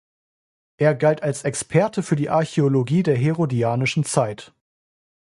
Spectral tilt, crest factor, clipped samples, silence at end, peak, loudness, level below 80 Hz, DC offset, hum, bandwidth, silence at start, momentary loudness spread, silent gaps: -6 dB/octave; 18 dB; under 0.1%; 0.9 s; -2 dBFS; -21 LUFS; -60 dBFS; under 0.1%; none; 11.5 kHz; 0.8 s; 5 LU; none